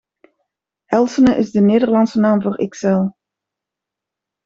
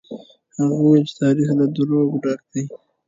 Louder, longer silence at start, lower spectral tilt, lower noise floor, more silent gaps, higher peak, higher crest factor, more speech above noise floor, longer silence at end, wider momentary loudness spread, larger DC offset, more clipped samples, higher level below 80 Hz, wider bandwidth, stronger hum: first, -16 LUFS vs -19 LUFS; first, 0.9 s vs 0.1 s; about the same, -7.5 dB/octave vs -7.5 dB/octave; first, -84 dBFS vs -38 dBFS; neither; about the same, -2 dBFS vs -4 dBFS; about the same, 16 dB vs 16 dB; first, 70 dB vs 20 dB; first, 1.35 s vs 0.3 s; second, 7 LU vs 19 LU; neither; neither; first, -52 dBFS vs -64 dBFS; about the same, 7.6 kHz vs 7.6 kHz; neither